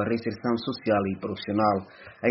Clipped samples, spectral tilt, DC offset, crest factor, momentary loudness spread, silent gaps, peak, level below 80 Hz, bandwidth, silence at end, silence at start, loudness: under 0.1%; -5 dB/octave; under 0.1%; 20 dB; 7 LU; none; -8 dBFS; -62 dBFS; 6 kHz; 0 s; 0 s; -27 LUFS